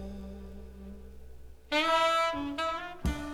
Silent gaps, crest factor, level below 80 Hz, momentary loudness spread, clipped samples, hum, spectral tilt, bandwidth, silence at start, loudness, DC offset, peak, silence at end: none; 18 dB; -44 dBFS; 23 LU; under 0.1%; none; -4 dB/octave; 19 kHz; 0 s; -29 LUFS; under 0.1%; -14 dBFS; 0 s